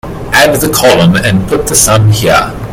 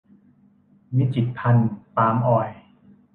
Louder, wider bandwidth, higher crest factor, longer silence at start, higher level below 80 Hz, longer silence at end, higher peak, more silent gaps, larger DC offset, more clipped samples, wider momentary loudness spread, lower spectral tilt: first, -7 LUFS vs -22 LUFS; first, over 20 kHz vs 4 kHz; second, 8 dB vs 18 dB; second, 0.05 s vs 0.9 s; first, -28 dBFS vs -58 dBFS; second, 0 s vs 0.55 s; first, 0 dBFS vs -6 dBFS; neither; neither; first, 1% vs under 0.1%; about the same, 5 LU vs 6 LU; second, -4 dB/octave vs -11 dB/octave